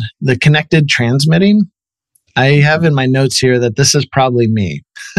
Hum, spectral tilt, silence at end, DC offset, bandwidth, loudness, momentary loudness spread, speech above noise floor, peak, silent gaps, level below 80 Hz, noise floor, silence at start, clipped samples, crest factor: none; -5 dB/octave; 0.05 s; under 0.1%; 12.5 kHz; -12 LUFS; 7 LU; 50 dB; 0 dBFS; none; -48 dBFS; -61 dBFS; 0 s; under 0.1%; 10 dB